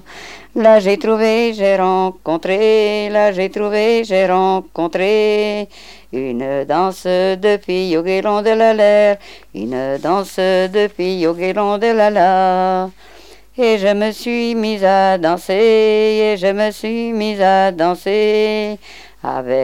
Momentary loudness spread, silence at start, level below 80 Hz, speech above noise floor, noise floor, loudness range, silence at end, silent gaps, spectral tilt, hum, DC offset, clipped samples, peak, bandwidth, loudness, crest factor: 10 LU; 0.1 s; -52 dBFS; 21 dB; -36 dBFS; 3 LU; 0 s; none; -5.5 dB/octave; none; 0.7%; under 0.1%; 0 dBFS; 15.5 kHz; -15 LUFS; 14 dB